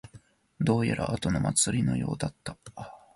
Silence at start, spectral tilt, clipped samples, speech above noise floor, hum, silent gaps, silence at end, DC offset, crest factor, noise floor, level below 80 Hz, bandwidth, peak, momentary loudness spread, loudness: 0.05 s; -5 dB/octave; under 0.1%; 27 dB; none; none; 0.2 s; under 0.1%; 18 dB; -55 dBFS; -50 dBFS; 11.5 kHz; -12 dBFS; 18 LU; -28 LUFS